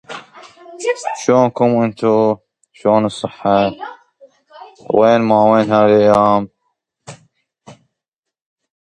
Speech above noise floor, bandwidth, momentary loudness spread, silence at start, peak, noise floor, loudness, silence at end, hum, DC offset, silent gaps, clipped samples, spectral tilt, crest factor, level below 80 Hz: 69 dB; 11 kHz; 14 LU; 0.1 s; 0 dBFS; -82 dBFS; -14 LUFS; 1.1 s; none; under 0.1%; none; under 0.1%; -6.5 dB/octave; 16 dB; -56 dBFS